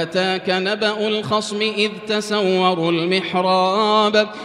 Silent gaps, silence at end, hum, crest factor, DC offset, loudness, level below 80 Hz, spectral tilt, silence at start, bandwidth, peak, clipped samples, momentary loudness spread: none; 0 s; none; 16 dB; under 0.1%; -18 LUFS; -64 dBFS; -4.5 dB/octave; 0 s; 12 kHz; -2 dBFS; under 0.1%; 5 LU